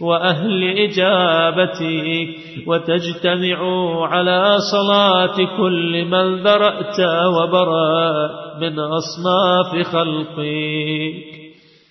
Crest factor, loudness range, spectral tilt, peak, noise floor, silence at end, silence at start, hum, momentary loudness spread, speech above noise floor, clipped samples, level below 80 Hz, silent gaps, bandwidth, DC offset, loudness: 16 dB; 4 LU; -5.5 dB/octave; -2 dBFS; -43 dBFS; 0.4 s; 0 s; none; 8 LU; 27 dB; under 0.1%; -64 dBFS; none; 6.2 kHz; under 0.1%; -17 LUFS